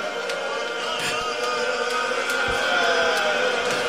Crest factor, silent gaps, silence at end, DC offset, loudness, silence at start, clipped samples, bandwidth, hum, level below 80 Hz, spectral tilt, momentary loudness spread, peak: 14 dB; none; 0 s; 0.2%; -22 LUFS; 0 s; under 0.1%; 16 kHz; none; -54 dBFS; -1.5 dB/octave; 7 LU; -10 dBFS